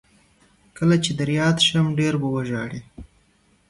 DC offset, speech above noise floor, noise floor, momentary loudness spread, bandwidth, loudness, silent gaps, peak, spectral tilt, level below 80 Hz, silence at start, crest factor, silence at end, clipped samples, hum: under 0.1%; 40 dB; -61 dBFS; 11 LU; 11.5 kHz; -21 LUFS; none; -6 dBFS; -5 dB/octave; -52 dBFS; 0.75 s; 18 dB; 0.65 s; under 0.1%; none